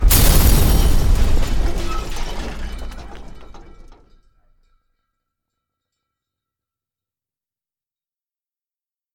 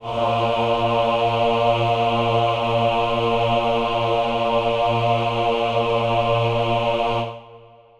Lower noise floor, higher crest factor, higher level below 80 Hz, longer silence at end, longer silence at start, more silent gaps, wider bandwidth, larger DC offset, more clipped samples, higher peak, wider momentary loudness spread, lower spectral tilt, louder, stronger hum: first, under -90 dBFS vs -46 dBFS; first, 18 dB vs 12 dB; first, -20 dBFS vs -42 dBFS; first, 5.55 s vs 0.4 s; about the same, 0 s vs 0 s; neither; first, 18.5 kHz vs 11.5 kHz; neither; neither; first, 0 dBFS vs -8 dBFS; first, 22 LU vs 2 LU; second, -4.5 dB/octave vs -6.5 dB/octave; about the same, -18 LUFS vs -20 LUFS; neither